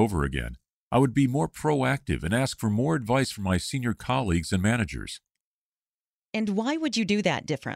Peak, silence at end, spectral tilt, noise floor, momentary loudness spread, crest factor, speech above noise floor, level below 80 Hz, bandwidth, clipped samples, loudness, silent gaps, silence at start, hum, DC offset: -8 dBFS; 0 s; -5.5 dB/octave; under -90 dBFS; 7 LU; 18 dB; over 64 dB; -44 dBFS; 16 kHz; under 0.1%; -26 LUFS; 0.70-0.91 s, 5.40-6.32 s; 0 s; none; under 0.1%